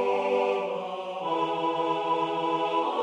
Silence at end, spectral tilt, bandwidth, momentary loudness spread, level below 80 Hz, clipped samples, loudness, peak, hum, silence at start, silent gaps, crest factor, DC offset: 0 s; -5.5 dB/octave; 9.8 kHz; 7 LU; -82 dBFS; under 0.1%; -28 LUFS; -14 dBFS; none; 0 s; none; 14 dB; under 0.1%